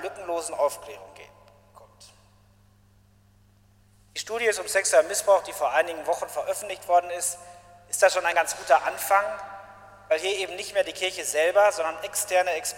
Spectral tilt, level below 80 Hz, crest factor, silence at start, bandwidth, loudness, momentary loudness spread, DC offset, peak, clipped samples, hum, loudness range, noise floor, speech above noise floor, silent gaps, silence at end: -0.5 dB/octave; -64 dBFS; 22 dB; 0 s; 16.5 kHz; -25 LUFS; 11 LU; under 0.1%; -6 dBFS; under 0.1%; none; 10 LU; -59 dBFS; 34 dB; none; 0 s